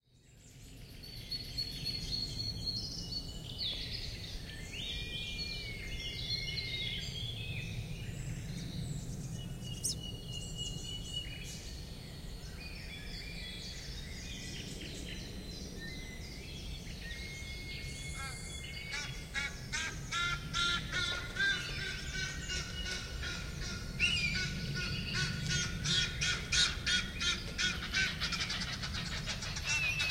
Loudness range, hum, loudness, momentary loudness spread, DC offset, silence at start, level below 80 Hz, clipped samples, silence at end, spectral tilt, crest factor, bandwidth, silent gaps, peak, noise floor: 11 LU; none; -37 LUFS; 13 LU; under 0.1%; 0.15 s; -48 dBFS; under 0.1%; 0 s; -2.5 dB/octave; 22 dB; 16 kHz; none; -16 dBFS; -60 dBFS